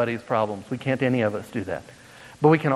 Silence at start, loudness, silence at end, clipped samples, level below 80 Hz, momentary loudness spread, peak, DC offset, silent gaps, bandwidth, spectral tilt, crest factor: 0 s; -25 LUFS; 0 s; under 0.1%; -62 dBFS; 14 LU; -4 dBFS; under 0.1%; none; 13 kHz; -7.5 dB/octave; 20 dB